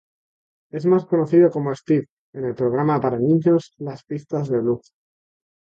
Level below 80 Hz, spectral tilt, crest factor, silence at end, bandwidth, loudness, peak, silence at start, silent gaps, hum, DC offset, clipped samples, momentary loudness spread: -64 dBFS; -9.5 dB/octave; 16 dB; 0.95 s; 7.4 kHz; -20 LUFS; -4 dBFS; 0.75 s; 2.10-2.33 s; none; under 0.1%; under 0.1%; 15 LU